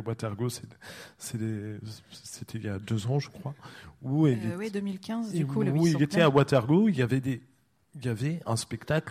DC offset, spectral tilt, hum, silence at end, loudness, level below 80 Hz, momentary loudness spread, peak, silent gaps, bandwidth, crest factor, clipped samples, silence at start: under 0.1%; -6.5 dB/octave; none; 0 s; -28 LUFS; -62 dBFS; 19 LU; -10 dBFS; none; 15.5 kHz; 18 dB; under 0.1%; 0 s